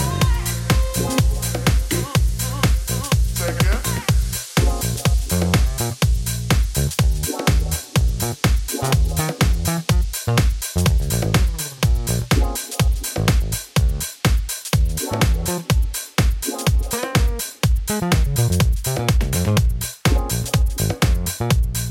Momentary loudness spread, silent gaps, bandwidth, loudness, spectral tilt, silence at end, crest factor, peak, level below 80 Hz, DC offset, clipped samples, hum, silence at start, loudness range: 3 LU; none; 17 kHz; -20 LUFS; -4.5 dB/octave; 0 s; 16 dB; -2 dBFS; -22 dBFS; under 0.1%; under 0.1%; none; 0 s; 1 LU